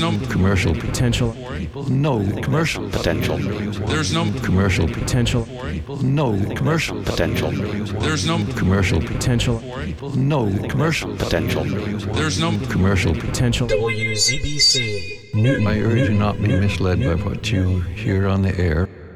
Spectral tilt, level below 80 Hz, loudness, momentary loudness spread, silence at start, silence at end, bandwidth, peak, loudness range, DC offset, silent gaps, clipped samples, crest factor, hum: -5 dB/octave; -34 dBFS; -20 LUFS; 6 LU; 0 s; 0 s; 14.5 kHz; -4 dBFS; 3 LU; under 0.1%; none; under 0.1%; 14 dB; none